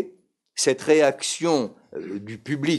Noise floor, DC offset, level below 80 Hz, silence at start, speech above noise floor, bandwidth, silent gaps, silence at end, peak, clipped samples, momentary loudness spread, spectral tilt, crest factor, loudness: -54 dBFS; under 0.1%; -74 dBFS; 0 s; 31 dB; 12 kHz; none; 0 s; -6 dBFS; under 0.1%; 16 LU; -4 dB/octave; 18 dB; -22 LUFS